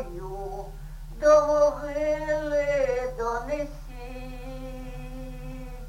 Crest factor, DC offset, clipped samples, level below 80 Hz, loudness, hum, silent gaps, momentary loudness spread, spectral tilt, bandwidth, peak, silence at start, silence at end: 18 dB; under 0.1%; under 0.1%; -40 dBFS; -25 LUFS; none; none; 20 LU; -5.5 dB/octave; 16 kHz; -8 dBFS; 0 s; 0 s